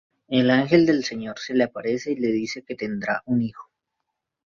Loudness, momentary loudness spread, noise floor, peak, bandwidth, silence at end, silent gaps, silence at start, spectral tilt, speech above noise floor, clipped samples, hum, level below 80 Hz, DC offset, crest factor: -23 LUFS; 12 LU; -81 dBFS; -4 dBFS; 7.2 kHz; 0.9 s; none; 0.3 s; -6 dB/octave; 58 dB; under 0.1%; none; -62 dBFS; under 0.1%; 20 dB